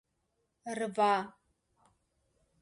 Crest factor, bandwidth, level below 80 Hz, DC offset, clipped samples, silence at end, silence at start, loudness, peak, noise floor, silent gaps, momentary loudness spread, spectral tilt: 20 dB; 11.5 kHz; -80 dBFS; under 0.1%; under 0.1%; 1.3 s; 0.65 s; -32 LUFS; -18 dBFS; -80 dBFS; none; 18 LU; -4.5 dB/octave